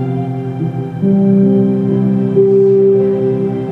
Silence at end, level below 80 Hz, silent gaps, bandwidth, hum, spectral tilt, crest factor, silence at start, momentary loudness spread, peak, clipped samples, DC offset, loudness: 0 s; -50 dBFS; none; 3.8 kHz; none; -11.5 dB/octave; 12 dB; 0 s; 10 LU; 0 dBFS; under 0.1%; under 0.1%; -12 LUFS